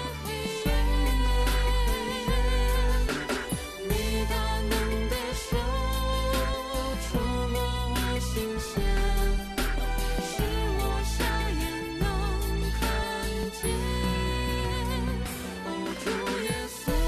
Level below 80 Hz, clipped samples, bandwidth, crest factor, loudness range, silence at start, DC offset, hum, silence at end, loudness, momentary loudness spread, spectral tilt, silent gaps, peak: -30 dBFS; under 0.1%; 14 kHz; 12 dB; 2 LU; 0 s; under 0.1%; none; 0 s; -29 LUFS; 5 LU; -4.5 dB/octave; none; -16 dBFS